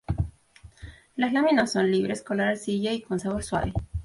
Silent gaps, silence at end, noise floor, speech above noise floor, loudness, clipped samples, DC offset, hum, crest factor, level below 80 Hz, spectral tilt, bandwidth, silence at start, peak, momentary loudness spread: none; 0 s; -52 dBFS; 27 dB; -26 LUFS; under 0.1%; under 0.1%; none; 16 dB; -42 dBFS; -5.5 dB/octave; 11.5 kHz; 0.1 s; -10 dBFS; 11 LU